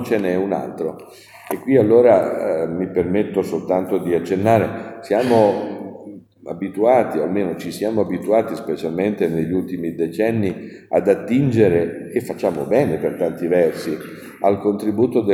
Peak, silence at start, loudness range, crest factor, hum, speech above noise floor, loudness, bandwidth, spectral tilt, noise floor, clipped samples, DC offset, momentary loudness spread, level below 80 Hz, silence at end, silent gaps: -2 dBFS; 0 s; 3 LU; 18 dB; none; 20 dB; -19 LUFS; 16 kHz; -7.5 dB/octave; -39 dBFS; under 0.1%; under 0.1%; 12 LU; -56 dBFS; 0 s; none